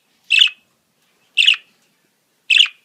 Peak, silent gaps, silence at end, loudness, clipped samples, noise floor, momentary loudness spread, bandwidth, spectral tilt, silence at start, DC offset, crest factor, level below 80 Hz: 0 dBFS; none; 0.15 s; -13 LUFS; under 0.1%; -63 dBFS; 6 LU; 16 kHz; 6 dB/octave; 0.3 s; under 0.1%; 18 dB; -86 dBFS